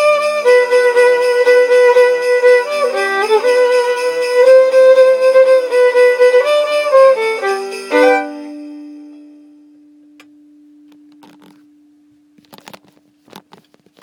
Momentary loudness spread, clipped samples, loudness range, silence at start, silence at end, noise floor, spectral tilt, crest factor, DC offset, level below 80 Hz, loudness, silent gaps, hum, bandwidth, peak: 9 LU; under 0.1%; 9 LU; 0 s; 4.95 s; -52 dBFS; -1.5 dB/octave; 12 dB; under 0.1%; -74 dBFS; -11 LUFS; none; none; 12 kHz; 0 dBFS